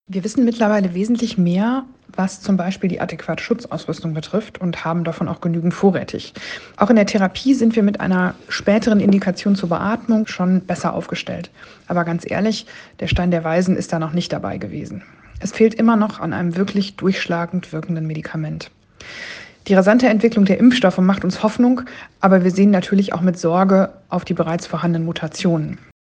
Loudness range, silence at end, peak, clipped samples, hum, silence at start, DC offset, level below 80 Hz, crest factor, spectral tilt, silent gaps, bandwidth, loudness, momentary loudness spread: 6 LU; 0.3 s; 0 dBFS; under 0.1%; none; 0.1 s; under 0.1%; -44 dBFS; 18 dB; -6.5 dB/octave; none; 9 kHz; -18 LUFS; 14 LU